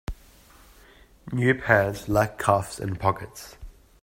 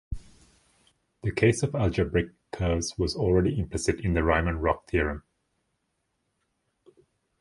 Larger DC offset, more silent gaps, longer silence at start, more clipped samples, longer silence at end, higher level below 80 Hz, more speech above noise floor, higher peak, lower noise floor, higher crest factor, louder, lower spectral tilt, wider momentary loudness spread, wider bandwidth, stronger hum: neither; neither; about the same, 0.1 s vs 0.1 s; neither; second, 0.3 s vs 2.2 s; second, -46 dBFS vs -38 dBFS; second, 29 dB vs 51 dB; first, -4 dBFS vs -8 dBFS; second, -53 dBFS vs -77 dBFS; about the same, 22 dB vs 22 dB; first, -24 LUFS vs -27 LUFS; about the same, -6 dB/octave vs -6 dB/octave; first, 20 LU vs 10 LU; first, 16 kHz vs 11.5 kHz; neither